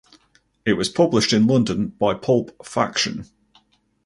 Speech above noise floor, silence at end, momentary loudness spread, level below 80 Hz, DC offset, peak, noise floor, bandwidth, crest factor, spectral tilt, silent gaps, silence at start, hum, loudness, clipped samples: 42 dB; 0.8 s; 9 LU; -52 dBFS; under 0.1%; -2 dBFS; -61 dBFS; 11.5 kHz; 20 dB; -5 dB/octave; none; 0.65 s; none; -20 LUFS; under 0.1%